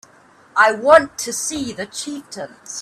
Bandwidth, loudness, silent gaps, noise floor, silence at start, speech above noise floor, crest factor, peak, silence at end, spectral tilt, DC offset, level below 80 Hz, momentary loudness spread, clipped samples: 14 kHz; -17 LUFS; none; -50 dBFS; 0.55 s; 32 dB; 20 dB; 0 dBFS; 0 s; -2 dB/octave; under 0.1%; -56 dBFS; 18 LU; under 0.1%